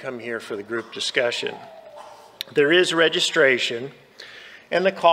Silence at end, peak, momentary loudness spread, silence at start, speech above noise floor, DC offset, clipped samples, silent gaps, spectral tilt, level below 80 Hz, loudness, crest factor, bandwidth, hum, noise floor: 0 s; -2 dBFS; 23 LU; 0 s; 22 dB; under 0.1%; under 0.1%; none; -3 dB/octave; -74 dBFS; -21 LUFS; 20 dB; 15.5 kHz; none; -43 dBFS